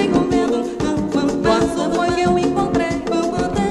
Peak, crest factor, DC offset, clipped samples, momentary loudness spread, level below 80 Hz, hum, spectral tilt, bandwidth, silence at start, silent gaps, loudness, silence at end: -2 dBFS; 14 dB; under 0.1%; under 0.1%; 3 LU; -38 dBFS; none; -6 dB/octave; 12 kHz; 0 s; none; -18 LUFS; 0 s